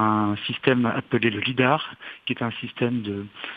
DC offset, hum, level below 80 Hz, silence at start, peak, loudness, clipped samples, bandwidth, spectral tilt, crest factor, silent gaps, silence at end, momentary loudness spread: under 0.1%; none; -66 dBFS; 0 s; -2 dBFS; -24 LUFS; under 0.1%; 5 kHz; -8.5 dB/octave; 22 dB; none; 0 s; 11 LU